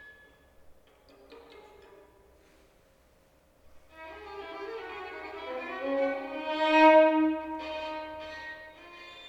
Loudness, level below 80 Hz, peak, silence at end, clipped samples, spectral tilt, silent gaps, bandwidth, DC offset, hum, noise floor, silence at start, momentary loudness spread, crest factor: -28 LUFS; -64 dBFS; -10 dBFS; 0 s; under 0.1%; -4.5 dB/octave; none; 8.2 kHz; under 0.1%; none; -63 dBFS; 0 s; 25 LU; 22 dB